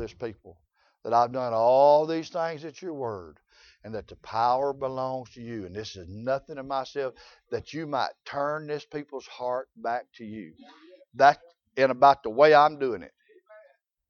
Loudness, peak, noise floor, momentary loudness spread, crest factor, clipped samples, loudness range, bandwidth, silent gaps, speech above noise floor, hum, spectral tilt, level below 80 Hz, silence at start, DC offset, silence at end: -25 LUFS; -4 dBFS; -60 dBFS; 20 LU; 22 dB; under 0.1%; 10 LU; 6.8 kHz; none; 34 dB; none; -5.5 dB/octave; -64 dBFS; 0 s; under 0.1%; 1 s